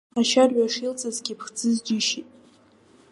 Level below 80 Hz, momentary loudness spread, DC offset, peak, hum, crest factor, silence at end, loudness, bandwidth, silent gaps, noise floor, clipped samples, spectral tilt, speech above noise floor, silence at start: -74 dBFS; 12 LU; under 0.1%; -6 dBFS; none; 20 dB; 0.9 s; -23 LUFS; 11.5 kHz; none; -56 dBFS; under 0.1%; -2.5 dB/octave; 33 dB; 0.15 s